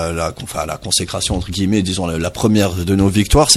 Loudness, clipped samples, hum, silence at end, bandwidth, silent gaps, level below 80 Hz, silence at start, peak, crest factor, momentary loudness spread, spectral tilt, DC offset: -17 LUFS; under 0.1%; none; 0 s; 14 kHz; none; -28 dBFS; 0 s; 0 dBFS; 16 dB; 9 LU; -4 dB/octave; under 0.1%